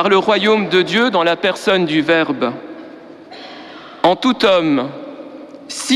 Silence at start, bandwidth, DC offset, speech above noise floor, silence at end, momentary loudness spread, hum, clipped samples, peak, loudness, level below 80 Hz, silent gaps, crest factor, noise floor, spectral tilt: 0 s; 13.5 kHz; under 0.1%; 22 dB; 0 s; 22 LU; none; under 0.1%; -2 dBFS; -15 LUFS; -58 dBFS; none; 14 dB; -36 dBFS; -4.5 dB/octave